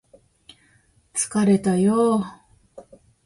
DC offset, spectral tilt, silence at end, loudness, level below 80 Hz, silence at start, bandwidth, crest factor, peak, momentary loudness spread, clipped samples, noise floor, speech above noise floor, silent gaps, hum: under 0.1%; -6 dB/octave; 0.45 s; -21 LUFS; -60 dBFS; 1.15 s; 11.5 kHz; 16 dB; -8 dBFS; 10 LU; under 0.1%; -60 dBFS; 41 dB; none; none